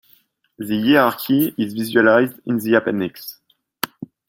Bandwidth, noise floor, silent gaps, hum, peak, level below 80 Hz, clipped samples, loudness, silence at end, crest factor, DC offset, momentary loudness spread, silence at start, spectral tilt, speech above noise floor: 17 kHz; -58 dBFS; none; none; 0 dBFS; -62 dBFS; under 0.1%; -18 LUFS; 0.25 s; 18 dB; under 0.1%; 14 LU; 0.6 s; -5.5 dB/octave; 40 dB